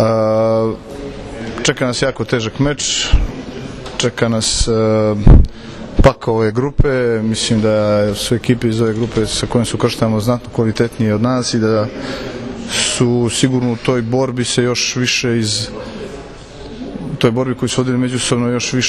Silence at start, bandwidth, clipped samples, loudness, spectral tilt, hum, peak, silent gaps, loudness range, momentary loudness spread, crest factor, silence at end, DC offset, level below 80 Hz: 0 s; 13.5 kHz; 0.3%; -15 LUFS; -5 dB/octave; none; 0 dBFS; none; 4 LU; 13 LU; 16 dB; 0 s; under 0.1%; -22 dBFS